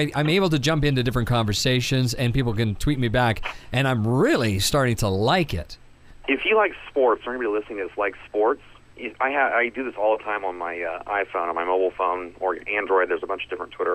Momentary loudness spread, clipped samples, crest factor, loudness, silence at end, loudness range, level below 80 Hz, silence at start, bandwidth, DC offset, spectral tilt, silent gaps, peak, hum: 9 LU; under 0.1%; 16 dB; -23 LUFS; 0 s; 3 LU; -40 dBFS; 0 s; 15.5 kHz; under 0.1%; -5.5 dB/octave; none; -6 dBFS; none